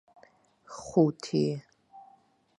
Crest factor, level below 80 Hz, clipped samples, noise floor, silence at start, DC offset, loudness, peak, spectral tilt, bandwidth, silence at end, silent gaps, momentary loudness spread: 22 dB; -68 dBFS; under 0.1%; -63 dBFS; 0.7 s; under 0.1%; -28 LUFS; -10 dBFS; -7 dB/octave; 11 kHz; 0.6 s; none; 18 LU